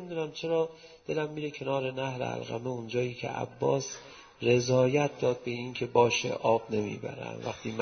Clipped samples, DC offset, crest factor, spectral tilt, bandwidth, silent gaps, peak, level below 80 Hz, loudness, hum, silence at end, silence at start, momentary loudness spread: under 0.1%; under 0.1%; 20 dB; -5 dB/octave; 6.6 kHz; none; -10 dBFS; -66 dBFS; -30 LUFS; none; 0 s; 0 s; 12 LU